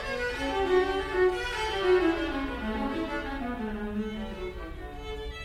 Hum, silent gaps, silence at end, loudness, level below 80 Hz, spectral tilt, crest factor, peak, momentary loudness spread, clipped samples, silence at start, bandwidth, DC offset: none; none; 0 s; -29 LUFS; -42 dBFS; -5.5 dB/octave; 16 dB; -14 dBFS; 14 LU; under 0.1%; 0 s; 13 kHz; under 0.1%